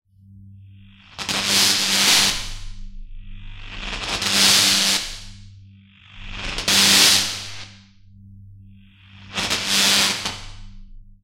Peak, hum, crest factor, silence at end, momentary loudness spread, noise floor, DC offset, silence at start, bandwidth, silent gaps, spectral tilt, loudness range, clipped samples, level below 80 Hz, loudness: 0 dBFS; none; 22 dB; 0.1 s; 21 LU; -47 dBFS; under 0.1%; 0.3 s; 16 kHz; none; 0 dB/octave; 5 LU; under 0.1%; -40 dBFS; -16 LUFS